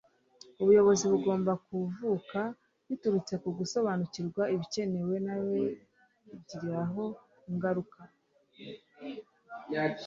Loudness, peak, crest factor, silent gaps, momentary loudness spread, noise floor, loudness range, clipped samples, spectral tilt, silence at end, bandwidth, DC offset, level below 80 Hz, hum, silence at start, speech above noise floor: -31 LUFS; -14 dBFS; 18 dB; none; 22 LU; -58 dBFS; 9 LU; under 0.1%; -6 dB/octave; 0 s; 7.8 kHz; under 0.1%; -72 dBFS; none; 0.6 s; 28 dB